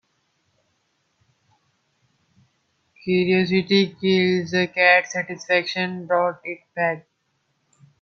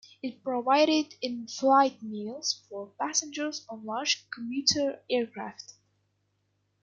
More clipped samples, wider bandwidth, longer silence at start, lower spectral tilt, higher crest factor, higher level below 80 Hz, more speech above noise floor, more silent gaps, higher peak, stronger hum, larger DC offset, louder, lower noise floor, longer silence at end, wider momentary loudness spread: neither; second, 6.8 kHz vs 9.2 kHz; first, 3.05 s vs 0.25 s; first, -5.5 dB/octave vs -2 dB/octave; about the same, 22 dB vs 22 dB; first, -68 dBFS vs -74 dBFS; first, 50 dB vs 46 dB; neither; first, -2 dBFS vs -8 dBFS; second, none vs 50 Hz at -65 dBFS; neither; first, -20 LUFS vs -28 LUFS; second, -71 dBFS vs -75 dBFS; second, 1 s vs 1.15 s; second, 12 LU vs 16 LU